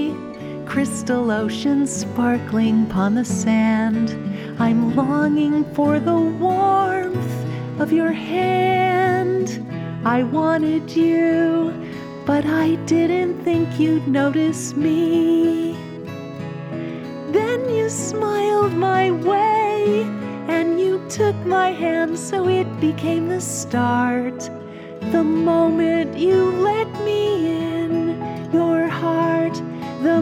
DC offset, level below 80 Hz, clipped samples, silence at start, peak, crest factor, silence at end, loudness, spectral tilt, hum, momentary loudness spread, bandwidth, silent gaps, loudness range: under 0.1%; -56 dBFS; under 0.1%; 0 s; -6 dBFS; 12 dB; 0 s; -19 LUFS; -6 dB/octave; none; 10 LU; 14 kHz; none; 2 LU